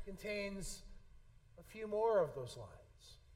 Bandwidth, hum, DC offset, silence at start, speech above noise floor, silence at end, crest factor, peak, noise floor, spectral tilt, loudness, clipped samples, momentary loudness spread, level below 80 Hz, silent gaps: 16 kHz; none; under 0.1%; 0 s; 22 dB; 0 s; 20 dB; -22 dBFS; -62 dBFS; -4.5 dB/octave; -40 LUFS; under 0.1%; 25 LU; -58 dBFS; none